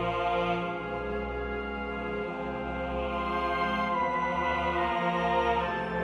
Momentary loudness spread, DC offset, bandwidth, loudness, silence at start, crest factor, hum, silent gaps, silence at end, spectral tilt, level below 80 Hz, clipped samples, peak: 7 LU; under 0.1%; 10.5 kHz; -30 LUFS; 0 s; 14 dB; none; none; 0 s; -6.5 dB/octave; -44 dBFS; under 0.1%; -16 dBFS